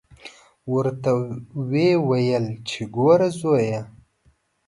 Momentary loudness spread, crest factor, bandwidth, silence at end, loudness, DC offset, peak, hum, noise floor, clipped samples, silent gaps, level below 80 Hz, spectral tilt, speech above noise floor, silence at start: 13 LU; 18 dB; 11.5 kHz; 0.8 s; -22 LUFS; under 0.1%; -4 dBFS; none; -62 dBFS; under 0.1%; none; -60 dBFS; -7 dB/octave; 42 dB; 0.25 s